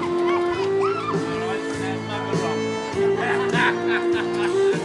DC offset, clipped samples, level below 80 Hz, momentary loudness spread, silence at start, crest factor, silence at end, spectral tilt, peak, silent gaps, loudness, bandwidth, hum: under 0.1%; under 0.1%; -58 dBFS; 6 LU; 0 s; 14 dB; 0 s; -5.5 dB/octave; -8 dBFS; none; -22 LUFS; 11.5 kHz; none